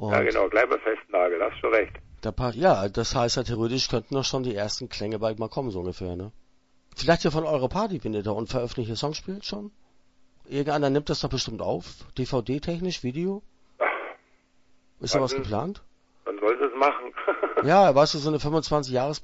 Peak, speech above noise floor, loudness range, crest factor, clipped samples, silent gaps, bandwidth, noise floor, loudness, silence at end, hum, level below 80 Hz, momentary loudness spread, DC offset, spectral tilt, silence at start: -6 dBFS; 36 dB; 7 LU; 20 dB; under 0.1%; none; 8 kHz; -61 dBFS; -26 LUFS; 0 s; none; -46 dBFS; 12 LU; under 0.1%; -5 dB/octave; 0 s